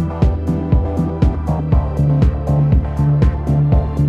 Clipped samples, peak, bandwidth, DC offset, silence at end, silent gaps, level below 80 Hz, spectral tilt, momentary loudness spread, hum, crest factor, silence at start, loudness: under 0.1%; -2 dBFS; 6.6 kHz; under 0.1%; 0 s; none; -20 dBFS; -10 dB/octave; 3 LU; none; 12 dB; 0 s; -16 LUFS